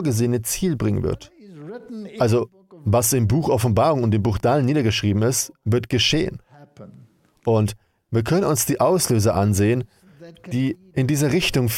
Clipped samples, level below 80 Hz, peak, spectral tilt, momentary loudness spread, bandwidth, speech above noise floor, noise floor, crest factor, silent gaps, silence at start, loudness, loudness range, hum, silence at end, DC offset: under 0.1%; -44 dBFS; -6 dBFS; -5 dB/octave; 13 LU; 16.5 kHz; 32 dB; -51 dBFS; 14 dB; none; 0 s; -20 LUFS; 3 LU; none; 0 s; under 0.1%